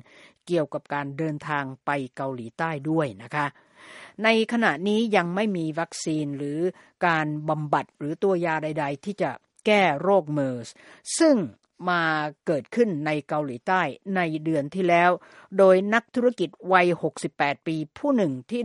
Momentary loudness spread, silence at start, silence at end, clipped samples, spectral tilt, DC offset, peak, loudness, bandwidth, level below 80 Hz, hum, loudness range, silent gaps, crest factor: 10 LU; 0.45 s; 0 s; under 0.1%; -5.5 dB/octave; under 0.1%; -4 dBFS; -25 LUFS; 11.5 kHz; -72 dBFS; none; 5 LU; none; 22 dB